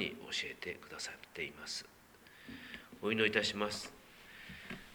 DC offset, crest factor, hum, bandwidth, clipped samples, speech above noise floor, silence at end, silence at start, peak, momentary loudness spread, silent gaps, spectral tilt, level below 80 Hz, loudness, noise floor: under 0.1%; 28 dB; none; over 20 kHz; under 0.1%; 21 dB; 0 s; 0 s; -14 dBFS; 22 LU; none; -3 dB/octave; -68 dBFS; -38 LUFS; -60 dBFS